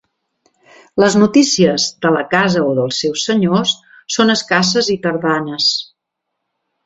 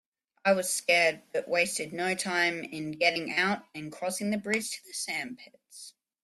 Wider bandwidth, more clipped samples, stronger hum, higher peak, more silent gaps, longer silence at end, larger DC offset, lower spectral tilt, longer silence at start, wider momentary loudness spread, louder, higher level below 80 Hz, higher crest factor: second, 8 kHz vs 15 kHz; neither; neither; first, 0 dBFS vs -10 dBFS; neither; first, 1 s vs 0.35 s; neither; first, -4 dB/octave vs -2.5 dB/octave; first, 0.95 s vs 0.45 s; second, 7 LU vs 17 LU; first, -14 LUFS vs -29 LUFS; first, -54 dBFS vs -76 dBFS; about the same, 16 dB vs 20 dB